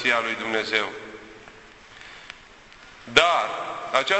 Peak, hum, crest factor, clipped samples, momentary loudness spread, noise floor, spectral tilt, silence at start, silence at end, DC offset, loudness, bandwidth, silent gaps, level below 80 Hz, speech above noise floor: -2 dBFS; none; 24 dB; under 0.1%; 25 LU; -48 dBFS; -2 dB/octave; 0 s; 0 s; under 0.1%; -23 LUFS; 8.4 kHz; none; -58 dBFS; 25 dB